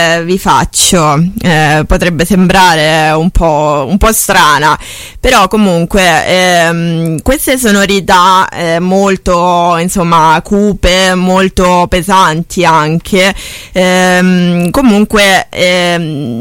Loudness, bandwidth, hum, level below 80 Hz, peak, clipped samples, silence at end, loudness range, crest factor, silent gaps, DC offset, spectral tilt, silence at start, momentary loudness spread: -8 LUFS; 17 kHz; none; -24 dBFS; 0 dBFS; 0.2%; 0 s; 1 LU; 8 dB; none; under 0.1%; -4 dB/octave; 0 s; 5 LU